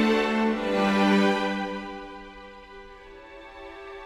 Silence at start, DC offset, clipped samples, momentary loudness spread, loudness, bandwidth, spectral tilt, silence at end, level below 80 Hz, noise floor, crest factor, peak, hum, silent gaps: 0 s; under 0.1%; under 0.1%; 24 LU; -24 LUFS; 12.5 kHz; -6 dB/octave; 0 s; -54 dBFS; -46 dBFS; 18 dB; -10 dBFS; none; none